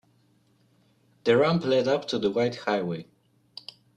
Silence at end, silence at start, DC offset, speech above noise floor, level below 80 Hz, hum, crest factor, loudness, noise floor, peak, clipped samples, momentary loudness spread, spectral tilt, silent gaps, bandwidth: 0.95 s; 1.25 s; under 0.1%; 40 dB; -66 dBFS; none; 18 dB; -25 LUFS; -64 dBFS; -8 dBFS; under 0.1%; 21 LU; -6 dB/octave; none; 10 kHz